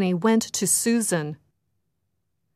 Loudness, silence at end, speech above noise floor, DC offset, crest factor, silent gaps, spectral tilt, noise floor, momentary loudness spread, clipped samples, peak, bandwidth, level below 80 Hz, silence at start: -22 LUFS; 1.2 s; 55 dB; under 0.1%; 16 dB; none; -4 dB/octave; -77 dBFS; 7 LU; under 0.1%; -8 dBFS; 15.5 kHz; -70 dBFS; 0 s